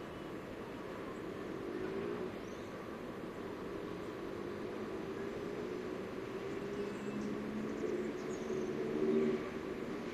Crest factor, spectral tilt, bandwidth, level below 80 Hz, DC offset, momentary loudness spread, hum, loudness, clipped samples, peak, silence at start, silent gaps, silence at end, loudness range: 18 dB; -6.5 dB/octave; 14 kHz; -64 dBFS; under 0.1%; 9 LU; none; -41 LUFS; under 0.1%; -22 dBFS; 0 s; none; 0 s; 5 LU